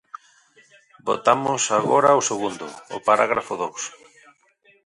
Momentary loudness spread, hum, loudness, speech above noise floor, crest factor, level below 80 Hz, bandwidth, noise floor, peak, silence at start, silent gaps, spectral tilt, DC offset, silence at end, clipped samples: 16 LU; none; -21 LUFS; 39 dB; 20 dB; -66 dBFS; 11.5 kHz; -59 dBFS; -2 dBFS; 1.05 s; none; -3 dB/octave; under 0.1%; 0.95 s; under 0.1%